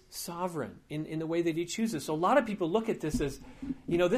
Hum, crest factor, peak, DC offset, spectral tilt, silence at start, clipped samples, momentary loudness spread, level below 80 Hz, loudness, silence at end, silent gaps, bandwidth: none; 18 dB; -14 dBFS; under 0.1%; -5.5 dB/octave; 0.1 s; under 0.1%; 13 LU; -52 dBFS; -32 LUFS; 0 s; none; 15.5 kHz